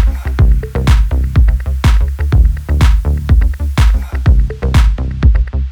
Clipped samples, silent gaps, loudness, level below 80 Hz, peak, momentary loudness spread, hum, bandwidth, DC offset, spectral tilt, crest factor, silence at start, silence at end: under 0.1%; none; -13 LUFS; -12 dBFS; 0 dBFS; 3 LU; none; 11 kHz; under 0.1%; -7 dB/octave; 10 dB; 0 s; 0 s